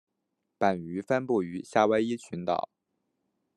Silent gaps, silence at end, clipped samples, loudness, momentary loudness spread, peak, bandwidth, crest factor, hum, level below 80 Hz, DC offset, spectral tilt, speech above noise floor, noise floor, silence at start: none; 0.95 s; under 0.1%; -29 LUFS; 9 LU; -8 dBFS; 11.5 kHz; 22 dB; none; -74 dBFS; under 0.1%; -6 dB/octave; 54 dB; -82 dBFS; 0.6 s